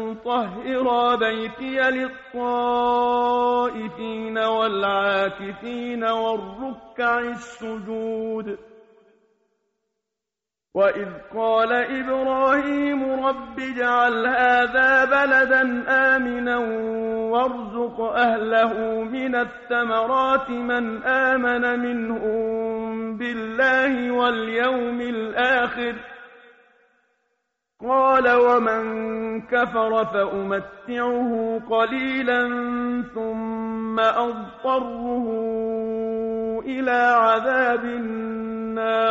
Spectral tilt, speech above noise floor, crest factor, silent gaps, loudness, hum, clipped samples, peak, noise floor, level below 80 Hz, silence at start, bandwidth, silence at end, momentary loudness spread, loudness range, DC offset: -2 dB/octave; 65 dB; 16 dB; none; -22 LUFS; none; under 0.1%; -6 dBFS; -87 dBFS; -56 dBFS; 0 s; 7.8 kHz; 0 s; 11 LU; 8 LU; under 0.1%